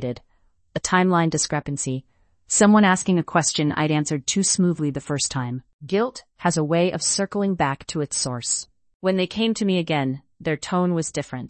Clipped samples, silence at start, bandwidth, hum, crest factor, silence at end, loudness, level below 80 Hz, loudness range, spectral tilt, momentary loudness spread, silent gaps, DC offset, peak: under 0.1%; 0 s; 8.8 kHz; none; 20 dB; 0 s; -22 LUFS; -56 dBFS; 4 LU; -4 dB/octave; 10 LU; 5.73-5.79 s, 8.94-9.00 s; under 0.1%; -2 dBFS